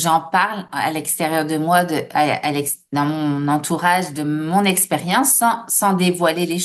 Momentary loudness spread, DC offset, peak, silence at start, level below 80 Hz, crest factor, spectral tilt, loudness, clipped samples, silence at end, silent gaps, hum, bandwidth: 6 LU; under 0.1%; -2 dBFS; 0 s; -66 dBFS; 16 dB; -3.5 dB/octave; -18 LUFS; under 0.1%; 0 s; none; none; 13 kHz